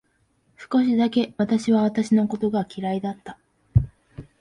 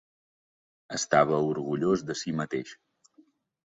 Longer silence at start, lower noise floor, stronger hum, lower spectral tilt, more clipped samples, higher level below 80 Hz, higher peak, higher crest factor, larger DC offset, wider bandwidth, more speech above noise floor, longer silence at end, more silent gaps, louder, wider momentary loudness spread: second, 0.6 s vs 0.9 s; about the same, -66 dBFS vs -63 dBFS; neither; first, -7.5 dB/octave vs -5 dB/octave; neither; first, -42 dBFS vs -66 dBFS; about the same, -4 dBFS vs -6 dBFS; second, 18 dB vs 24 dB; neither; first, 10.5 kHz vs 8 kHz; first, 44 dB vs 36 dB; second, 0.2 s vs 1.05 s; neither; first, -23 LUFS vs -28 LUFS; about the same, 11 LU vs 12 LU